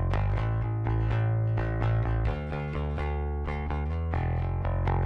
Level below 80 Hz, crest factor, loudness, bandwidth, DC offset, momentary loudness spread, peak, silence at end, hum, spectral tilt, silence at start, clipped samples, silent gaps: -34 dBFS; 14 dB; -30 LUFS; 5.4 kHz; under 0.1%; 5 LU; -14 dBFS; 0 s; none; -9.5 dB/octave; 0 s; under 0.1%; none